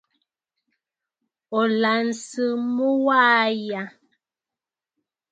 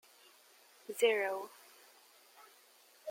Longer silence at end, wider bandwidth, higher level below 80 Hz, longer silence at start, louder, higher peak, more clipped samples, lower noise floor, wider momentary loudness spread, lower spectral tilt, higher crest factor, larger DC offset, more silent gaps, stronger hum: first, 1.4 s vs 0 s; second, 9.2 kHz vs 16.5 kHz; first, -78 dBFS vs under -90 dBFS; first, 1.5 s vs 0.9 s; first, -21 LUFS vs -34 LUFS; first, -4 dBFS vs -18 dBFS; neither; first, -90 dBFS vs -64 dBFS; second, 12 LU vs 28 LU; first, -4 dB/octave vs -1 dB/octave; about the same, 20 dB vs 22 dB; neither; neither; neither